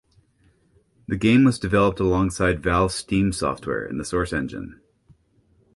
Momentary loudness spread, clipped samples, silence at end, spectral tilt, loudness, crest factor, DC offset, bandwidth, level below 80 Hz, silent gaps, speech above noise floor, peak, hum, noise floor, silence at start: 13 LU; under 0.1%; 1 s; -6 dB/octave; -22 LUFS; 18 dB; under 0.1%; 11.5 kHz; -40 dBFS; none; 40 dB; -6 dBFS; none; -61 dBFS; 1.1 s